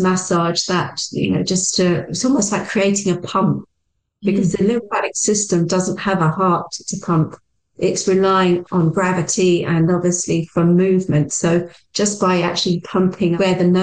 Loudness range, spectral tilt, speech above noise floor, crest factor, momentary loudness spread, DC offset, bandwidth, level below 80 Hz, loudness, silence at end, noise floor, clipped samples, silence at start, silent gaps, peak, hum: 2 LU; -5 dB/octave; 55 dB; 10 dB; 5 LU; 0.2%; 10 kHz; -52 dBFS; -17 LUFS; 0 s; -72 dBFS; under 0.1%; 0 s; none; -6 dBFS; none